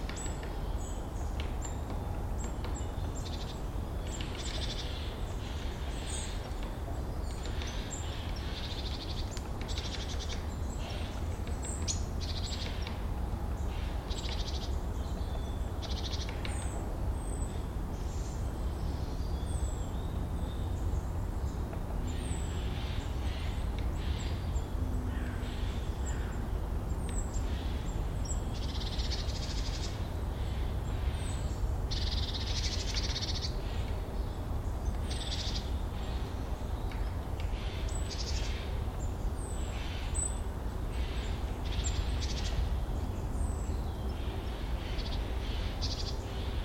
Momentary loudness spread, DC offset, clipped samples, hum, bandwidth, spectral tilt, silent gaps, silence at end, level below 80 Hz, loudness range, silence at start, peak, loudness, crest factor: 4 LU; under 0.1%; under 0.1%; none; 16.5 kHz; -5 dB/octave; none; 0 s; -36 dBFS; 3 LU; 0 s; -18 dBFS; -37 LUFS; 16 dB